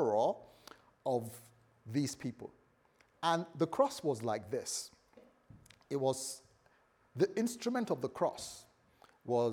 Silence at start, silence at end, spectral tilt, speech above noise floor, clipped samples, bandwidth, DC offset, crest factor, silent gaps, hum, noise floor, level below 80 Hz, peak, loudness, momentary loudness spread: 0 s; 0 s; -5 dB/octave; 35 dB; under 0.1%; over 20 kHz; under 0.1%; 20 dB; none; none; -70 dBFS; -78 dBFS; -18 dBFS; -36 LUFS; 19 LU